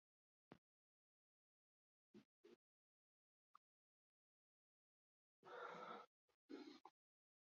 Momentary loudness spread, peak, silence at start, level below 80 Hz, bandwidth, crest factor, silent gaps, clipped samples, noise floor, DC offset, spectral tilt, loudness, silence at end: 8 LU; -44 dBFS; 0.5 s; under -90 dBFS; 6.8 kHz; 24 dB; 0.58-2.14 s, 2.25-2.44 s, 2.56-5.43 s, 6.07-6.28 s, 6.34-6.49 s; under 0.1%; under -90 dBFS; under 0.1%; -2.5 dB/octave; -59 LUFS; 0.5 s